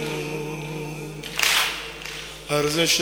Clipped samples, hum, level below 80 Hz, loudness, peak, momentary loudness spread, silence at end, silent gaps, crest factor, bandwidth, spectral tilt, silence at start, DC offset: under 0.1%; none; -50 dBFS; -24 LUFS; 0 dBFS; 14 LU; 0 s; none; 26 dB; over 20 kHz; -2.5 dB/octave; 0 s; under 0.1%